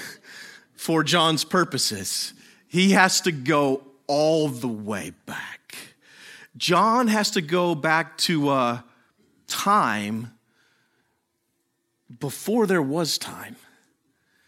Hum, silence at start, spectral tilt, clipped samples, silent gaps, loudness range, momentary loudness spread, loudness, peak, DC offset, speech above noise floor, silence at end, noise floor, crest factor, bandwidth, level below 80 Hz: none; 0 s; -4 dB/octave; under 0.1%; none; 6 LU; 18 LU; -22 LUFS; 0 dBFS; under 0.1%; 51 dB; 0.95 s; -74 dBFS; 24 dB; 16.5 kHz; -72 dBFS